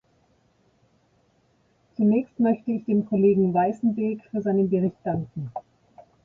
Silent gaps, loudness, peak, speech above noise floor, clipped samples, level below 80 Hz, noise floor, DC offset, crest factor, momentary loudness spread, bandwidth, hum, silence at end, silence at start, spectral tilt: none; -24 LUFS; -10 dBFS; 42 dB; under 0.1%; -62 dBFS; -65 dBFS; under 0.1%; 16 dB; 13 LU; 3 kHz; none; 0.25 s; 2 s; -11.5 dB/octave